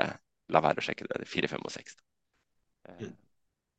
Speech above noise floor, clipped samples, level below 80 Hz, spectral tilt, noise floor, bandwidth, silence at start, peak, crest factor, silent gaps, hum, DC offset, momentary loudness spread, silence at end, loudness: 47 dB; under 0.1%; -70 dBFS; -5 dB/octave; -79 dBFS; 9 kHz; 0 s; -6 dBFS; 30 dB; none; none; under 0.1%; 19 LU; 0.65 s; -31 LUFS